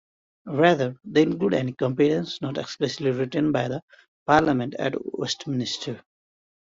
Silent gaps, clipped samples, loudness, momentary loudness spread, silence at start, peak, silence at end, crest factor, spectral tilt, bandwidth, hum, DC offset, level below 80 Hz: 3.82-3.88 s, 4.08-4.26 s; under 0.1%; -24 LUFS; 11 LU; 0.45 s; -4 dBFS; 0.75 s; 20 dB; -6 dB/octave; 7.8 kHz; none; under 0.1%; -58 dBFS